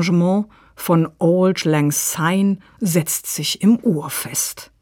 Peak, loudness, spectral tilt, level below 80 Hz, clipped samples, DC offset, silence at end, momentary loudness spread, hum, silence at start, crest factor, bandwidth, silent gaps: -4 dBFS; -18 LUFS; -5 dB/octave; -58 dBFS; under 0.1%; under 0.1%; 0.15 s; 6 LU; none; 0 s; 14 dB; 19 kHz; none